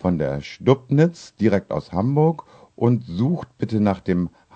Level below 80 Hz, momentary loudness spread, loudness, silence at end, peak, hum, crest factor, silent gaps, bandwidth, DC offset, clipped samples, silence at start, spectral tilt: -50 dBFS; 7 LU; -21 LUFS; 0.25 s; -2 dBFS; none; 20 dB; none; 8.6 kHz; under 0.1%; under 0.1%; 0 s; -8.5 dB/octave